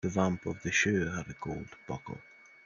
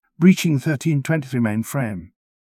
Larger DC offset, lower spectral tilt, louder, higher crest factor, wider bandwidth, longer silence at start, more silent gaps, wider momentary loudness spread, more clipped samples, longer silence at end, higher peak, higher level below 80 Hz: neither; second, -4.5 dB/octave vs -6.5 dB/octave; second, -33 LUFS vs -20 LUFS; about the same, 20 dB vs 18 dB; second, 7.4 kHz vs 16 kHz; second, 0.05 s vs 0.2 s; neither; first, 14 LU vs 10 LU; neither; about the same, 0.35 s vs 0.4 s; second, -12 dBFS vs -2 dBFS; second, -60 dBFS vs -54 dBFS